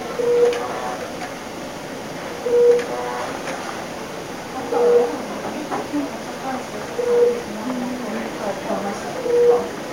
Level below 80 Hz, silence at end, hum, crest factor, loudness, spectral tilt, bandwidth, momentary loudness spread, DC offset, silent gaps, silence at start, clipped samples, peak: -56 dBFS; 0 s; none; 16 dB; -22 LUFS; -4.5 dB/octave; 16 kHz; 14 LU; 0.2%; none; 0 s; under 0.1%; -4 dBFS